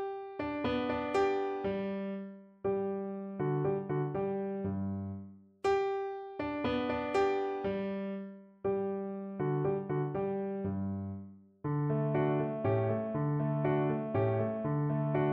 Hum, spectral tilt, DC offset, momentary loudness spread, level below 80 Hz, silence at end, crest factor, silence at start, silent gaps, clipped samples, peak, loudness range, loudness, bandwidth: none; -8.5 dB/octave; under 0.1%; 9 LU; -62 dBFS; 0 s; 14 dB; 0 s; none; under 0.1%; -18 dBFS; 4 LU; -34 LUFS; 8.2 kHz